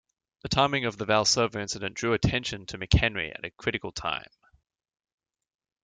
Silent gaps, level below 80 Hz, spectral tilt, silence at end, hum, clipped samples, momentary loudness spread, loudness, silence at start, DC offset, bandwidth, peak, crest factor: none; -42 dBFS; -4 dB/octave; 1.65 s; none; under 0.1%; 11 LU; -27 LUFS; 0.45 s; under 0.1%; 9.6 kHz; -6 dBFS; 22 dB